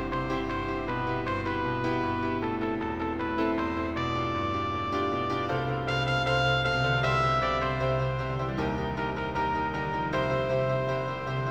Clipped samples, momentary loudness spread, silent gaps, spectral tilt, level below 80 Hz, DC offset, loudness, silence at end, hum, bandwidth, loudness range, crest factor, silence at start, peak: under 0.1%; 6 LU; none; -6.5 dB/octave; -44 dBFS; 0.2%; -28 LUFS; 0 s; none; 8.8 kHz; 3 LU; 14 dB; 0 s; -14 dBFS